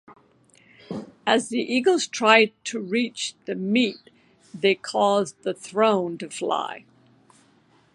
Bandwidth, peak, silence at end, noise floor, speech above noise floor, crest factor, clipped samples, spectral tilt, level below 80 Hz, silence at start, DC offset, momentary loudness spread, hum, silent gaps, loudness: 11.5 kHz; 0 dBFS; 1.15 s; -59 dBFS; 37 dB; 24 dB; under 0.1%; -3.5 dB/octave; -74 dBFS; 0.1 s; under 0.1%; 14 LU; none; none; -23 LUFS